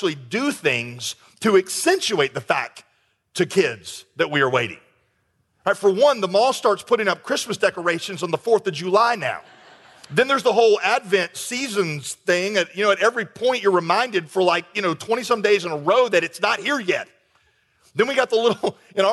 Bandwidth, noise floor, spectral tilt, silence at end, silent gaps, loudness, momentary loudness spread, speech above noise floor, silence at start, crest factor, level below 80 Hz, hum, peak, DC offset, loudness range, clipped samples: 12.5 kHz; -68 dBFS; -3.5 dB/octave; 0 s; none; -20 LUFS; 8 LU; 47 dB; 0 s; 16 dB; -70 dBFS; none; -6 dBFS; under 0.1%; 2 LU; under 0.1%